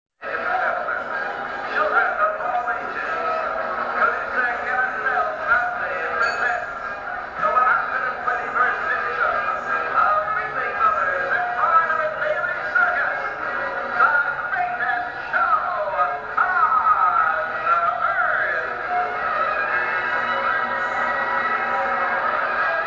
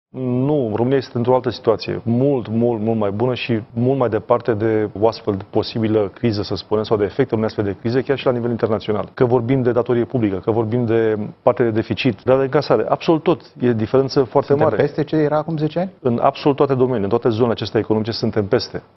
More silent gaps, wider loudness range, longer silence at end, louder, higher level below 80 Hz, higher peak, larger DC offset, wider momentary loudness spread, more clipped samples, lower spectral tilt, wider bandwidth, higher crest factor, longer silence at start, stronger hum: neither; about the same, 3 LU vs 2 LU; second, 0 s vs 0.15 s; about the same, -21 LUFS vs -19 LUFS; about the same, -56 dBFS vs -52 dBFS; second, -6 dBFS vs 0 dBFS; neither; about the same, 7 LU vs 5 LU; neither; second, -4 dB/octave vs -8.5 dB/octave; first, 7.6 kHz vs 6.2 kHz; about the same, 16 dB vs 18 dB; about the same, 0.2 s vs 0.15 s; neither